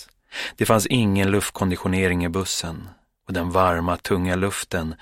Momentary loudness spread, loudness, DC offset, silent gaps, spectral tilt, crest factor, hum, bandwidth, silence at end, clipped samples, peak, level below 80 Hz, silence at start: 11 LU; -22 LUFS; under 0.1%; none; -5 dB/octave; 20 dB; none; 16.5 kHz; 0.05 s; under 0.1%; -2 dBFS; -44 dBFS; 0 s